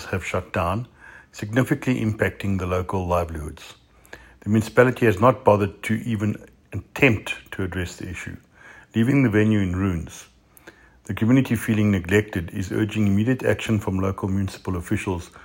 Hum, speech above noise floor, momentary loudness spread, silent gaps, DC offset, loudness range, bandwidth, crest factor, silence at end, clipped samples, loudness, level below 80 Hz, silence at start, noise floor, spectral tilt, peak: none; 28 dB; 16 LU; none; under 0.1%; 4 LU; 16.5 kHz; 22 dB; 0.05 s; under 0.1%; -22 LUFS; -50 dBFS; 0 s; -50 dBFS; -7 dB/octave; -2 dBFS